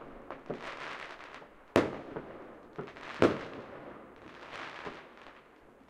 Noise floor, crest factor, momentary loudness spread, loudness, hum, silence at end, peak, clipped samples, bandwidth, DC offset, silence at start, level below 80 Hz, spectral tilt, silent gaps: -58 dBFS; 32 dB; 22 LU; -36 LUFS; none; 0.05 s; -6 dBFS; under 0.1%; 15.5 kHz; under 0.1%; 0 s; -64 dBFS; -6 dB/octave; none